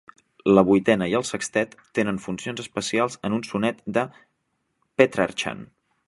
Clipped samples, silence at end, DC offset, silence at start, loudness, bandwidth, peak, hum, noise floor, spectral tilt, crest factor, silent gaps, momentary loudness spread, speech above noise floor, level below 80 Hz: under 0.1%; 0.4 s; under 0.1%; 0.45 s; -23 LUFS; 11.5 kHz; -2 dBFS; none; -74 dBFS; -5 dB/octave; 22 dB; none; 12 LU; 51 dB; -58 dBFS